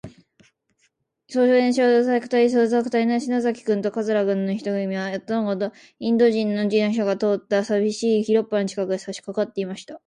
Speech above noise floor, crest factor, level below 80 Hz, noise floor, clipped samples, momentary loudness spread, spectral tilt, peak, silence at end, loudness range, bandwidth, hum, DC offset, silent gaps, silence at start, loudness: 47 dB; 14 dB; -68 dBFS; -68 dBFS; under 0.1%; 9 LU; -6 dB/octave; -6 dBFS; 0.1 s; 3 LU; 10 kHz; none; under 0.1%; none; 0.05 s; -22 LUFS